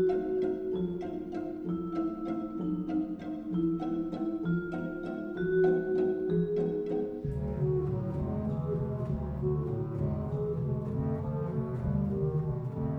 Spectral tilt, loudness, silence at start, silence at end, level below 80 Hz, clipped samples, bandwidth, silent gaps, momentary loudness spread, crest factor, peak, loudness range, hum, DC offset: -10.5 dB/octave; -32 LUFS; 0 s; 0 s; -48 dBFS; under 0.1%; 5.8 kHz; none; 6 LU; 14 dB; -18 dBFS; 3 LU; none; under 0.1%